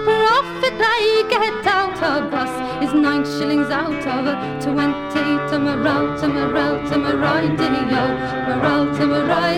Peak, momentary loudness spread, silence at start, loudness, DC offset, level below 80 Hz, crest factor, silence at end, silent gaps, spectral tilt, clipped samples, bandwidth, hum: -4 dBFS; 5 LU; 0 s; -18 LUFS; under 0.1%; -46 dBFS; 14 dB; 0 s; none; -6 dB/octave; under 0.1%; 13 kHz; none